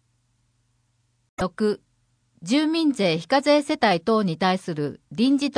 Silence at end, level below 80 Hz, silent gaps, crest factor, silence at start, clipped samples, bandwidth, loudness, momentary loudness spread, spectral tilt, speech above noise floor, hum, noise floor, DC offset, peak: 0.05 s; -60 dBFS; none; 18 dB; 1.4 s; under 0.1%; 10.5 kHz; -22 LUFS; 11 LU; -5.5 dB/octave; 46 dB; none; -68 dBFS; under 0.1%; -6 dBFS